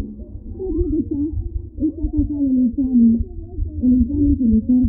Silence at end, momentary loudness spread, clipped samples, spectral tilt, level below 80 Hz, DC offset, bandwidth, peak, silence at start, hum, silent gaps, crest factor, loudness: 0 s; 14 LU; under 0.1%; -18 dB/octave; -28 dBFS; under 0.1%; 0.9 kHz; -6 dBFS; 0 s; none; none; 12 dB; -19 LUFS